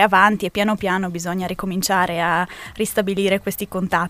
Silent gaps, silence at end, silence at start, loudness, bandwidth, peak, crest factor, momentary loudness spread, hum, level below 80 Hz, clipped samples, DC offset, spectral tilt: none; 0 s; 0 s; -20 LUFS; 16 kHz; 0 dBFS; 20 dB; 8 LU; none; -48 dBFS; under 0.1%; under 0.1%; -4.5 dB/octave